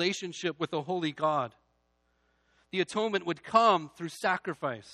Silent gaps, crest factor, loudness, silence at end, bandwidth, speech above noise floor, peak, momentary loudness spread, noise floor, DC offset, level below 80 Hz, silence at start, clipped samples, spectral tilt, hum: none; 22 dB; -30 LUFS; 0 s; 13 kHz; 43 dB; -8 dBFS; 11 LU; -73 dBFS; under 0.1%; -74 dBFS; 0 s; under 0.1%; -4.5 dB/octave; 60 Hz at -65 dBFS